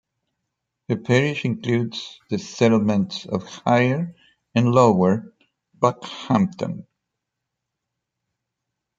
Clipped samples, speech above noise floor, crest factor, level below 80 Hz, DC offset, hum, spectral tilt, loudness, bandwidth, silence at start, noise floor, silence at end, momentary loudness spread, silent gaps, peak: under 0.1%; 61 dB; 20 dB; -64 dBFS; under 0.1%; none; -6.5 dB/octave; -21 LUFS; 7.8 kHz; 0.9 s; -82 dBFS; 2.15 s; 13 LU; none; -2 dBFS